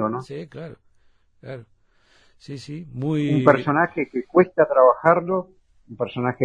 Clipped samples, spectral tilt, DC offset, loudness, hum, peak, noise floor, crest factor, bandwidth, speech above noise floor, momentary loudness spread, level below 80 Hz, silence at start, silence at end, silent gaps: under 0.1%; -8.5 dB/octave; under 0.1%; -20 LUFS; none; 0 dBFS; -59 dBFS; 22 dB; 9.8 kHz; 38 dB; 23 LU; -60 dBFS; 0 s; 0 s; none